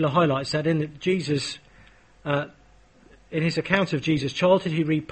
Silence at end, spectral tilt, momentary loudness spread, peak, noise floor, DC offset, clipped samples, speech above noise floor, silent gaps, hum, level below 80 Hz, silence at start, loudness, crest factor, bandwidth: 0.05 s; -6 dB/octave; 11 LU; -6 dBFS; -54 dBFS; under 0.1%; under 0.1%; 31 dB; none; none; -56 dBFS; 0 s; -24 LUFS; 20 dB; 8.8 kHz